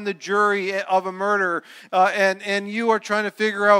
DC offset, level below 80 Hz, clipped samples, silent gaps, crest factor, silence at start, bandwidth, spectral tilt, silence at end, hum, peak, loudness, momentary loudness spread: under 0.1%; -76 dBFS; under 0.1%; none; 18 dB; 0 s; 15 kHz; -4 dB/octave; 0 s; none; -4 dBFS; -21 LUFS; 5 LU